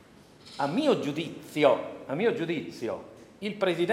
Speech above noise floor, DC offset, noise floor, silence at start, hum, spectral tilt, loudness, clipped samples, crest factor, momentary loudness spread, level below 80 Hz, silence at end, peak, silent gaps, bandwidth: 25 dB; under 0.1%; -53 dBFS; 0.45 s; none; -6 dB/octave; -29 LUFS; under 0.1%; 22 dB; 13 LU; -70 dBFS; 0 s; -6 dBFS; none; 16 kHz